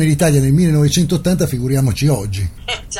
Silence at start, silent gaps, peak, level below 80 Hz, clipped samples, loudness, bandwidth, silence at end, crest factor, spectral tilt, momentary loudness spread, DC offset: 0 s; none; -2 dBFS; -32 dBFS; under 0.1%; -15 LUFS; 16.5 kHz; 0 s; 14 dB; -6 dB/octave; 10 LU; under 0.1%